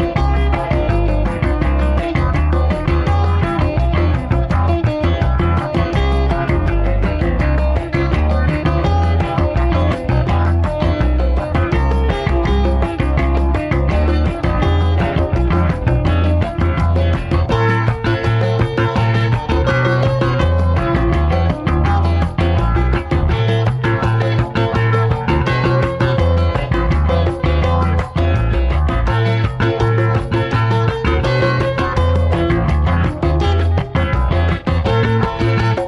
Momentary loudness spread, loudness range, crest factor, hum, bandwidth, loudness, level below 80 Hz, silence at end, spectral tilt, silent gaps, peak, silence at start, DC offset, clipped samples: 2 LU; 1 LU; 14 dB; none; 10.5 kHz; -16 LUFS; -20 dBFS; 0 s; -8 dB/octave; none; -2 dBFS; 0 s; 0.2%; under 0.1%